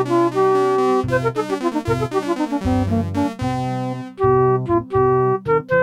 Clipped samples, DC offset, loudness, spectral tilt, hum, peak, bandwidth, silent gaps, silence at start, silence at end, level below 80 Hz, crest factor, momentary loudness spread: under 0.1%; under 0.1%; -19 LUFS; -7.5 dB/octave; none; -6 dBFS; 12.5 kHz; none; 0 s; 0 s; -42 dBFS; 14 dB; 6 LU